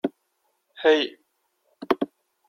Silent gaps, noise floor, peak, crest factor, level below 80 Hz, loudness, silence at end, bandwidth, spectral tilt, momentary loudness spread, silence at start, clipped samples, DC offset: none; -73 dBFS; -6 dBFS; 22 dB; -72 dBFS; -24 LUFS; 0.45 s; 12 kHz; -4.5 dB/octave; 13 LU; 0.05 s; under 0.1%; under 0.1%